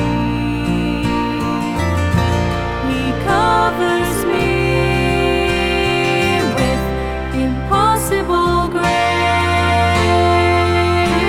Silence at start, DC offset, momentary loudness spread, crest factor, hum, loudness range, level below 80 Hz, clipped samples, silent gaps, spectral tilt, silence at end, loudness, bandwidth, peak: 0 s; under 0.1%; 6 LU; 14 dB; none; 2 LU; -28 dBFS; under 0.1%; none; -5.5 dB/octave; 0 s; -16 LUFS; 16.5 kHz; 0 dBFS